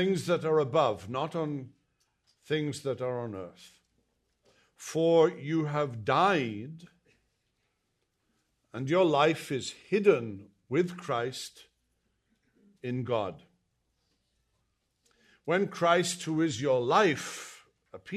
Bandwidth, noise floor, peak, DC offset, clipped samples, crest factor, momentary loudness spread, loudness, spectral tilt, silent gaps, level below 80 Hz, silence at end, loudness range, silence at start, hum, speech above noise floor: 13.5 kHz; -78 dBFS; -10 dBFS; under 0.1%; under 0.1%; 22 dB; 17 LU; -29 LUFS; -5.5 dB/octave; none; -74 dBFS; 0 s; 9 LU; 0 s; none; 50 dB